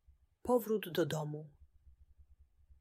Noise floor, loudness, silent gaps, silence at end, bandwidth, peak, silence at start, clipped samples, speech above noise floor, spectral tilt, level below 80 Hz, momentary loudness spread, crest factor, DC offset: -65 dBFS; -37 LUFS; none; 0.9 s; 16 kHz; -20 dBFS; 0.45 s; under 0.1%; 30 dB; -6 dB/octave; -66 dBFS; 14 LU; 20 dB; under 0.1%